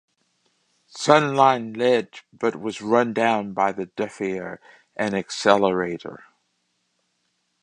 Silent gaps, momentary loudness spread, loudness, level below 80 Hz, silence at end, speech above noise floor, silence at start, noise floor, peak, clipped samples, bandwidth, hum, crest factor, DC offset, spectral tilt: none; 18 LU; -22 LUFS; -66 dBFS; 1.45 s; 50 dB; 0.95 s; -72 dBFS; 0 dBFS; under 0.1%; 10.5 kHz; none; 24 dB; under 0.1%; -5 dB/octave